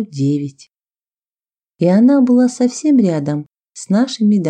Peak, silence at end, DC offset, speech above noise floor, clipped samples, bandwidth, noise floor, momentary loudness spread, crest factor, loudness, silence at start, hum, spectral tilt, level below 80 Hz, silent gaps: -2 dBFS; 0 s; under 0.1%; over 76 dB; under 0.1%; 9.4 kHz; under -90 dBFS; 12 LU; 12 dB; -14 LUFS; 0 s; none; -7 dB/octave; -68 dBFS; 3.60-3.64 s